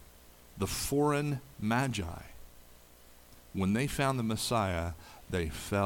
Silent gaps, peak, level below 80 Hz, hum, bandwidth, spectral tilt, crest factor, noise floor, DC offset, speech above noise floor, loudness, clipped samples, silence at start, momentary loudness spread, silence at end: none; -16 dBFS; -50 dBFS; 60 Hz at -60 dBFS; 19 kHz; -5 dB/octave; 18 dB; -56 dBFS; under 0.1%; 25 dB; -33 LUFS; under 0.1%; 0 s; 12 LU; 0 s